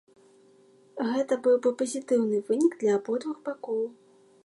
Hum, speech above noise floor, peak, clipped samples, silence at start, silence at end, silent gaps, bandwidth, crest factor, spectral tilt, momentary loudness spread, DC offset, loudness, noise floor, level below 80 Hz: none; 32 dB; -12 dBFS; under 0.1%; 0.95 s; 0.55 s; none; 11.5 kHz; 16 dB; -5.5 dB/octave; 10 LU; under 0.1%; -27 LUFS; -58 dBFS; -82 dBFS